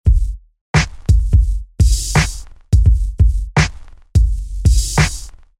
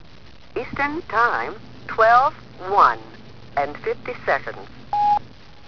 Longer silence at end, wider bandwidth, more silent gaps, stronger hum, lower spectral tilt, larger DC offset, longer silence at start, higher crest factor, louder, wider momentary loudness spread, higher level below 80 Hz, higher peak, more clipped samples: about the same, 0.3 s vs 0.4 s; first, 13.5 kHz vs 5.4 kHz; first, 0.61-0.74 s vs none; neither; about the same, -5 dB/octave vs -5.5 dB/octave; second, under 0.1% vs 1%; second, 0.05 s vs 0.55 s; second, 12 dB vs 20 dB; first, -17 LUFS vs -21 LUFS; second, 8 LU vs 16 LU; first, -16 dBFS vs -50 dBFS; about the same, -2 dBFS vs -2 dBFS; neither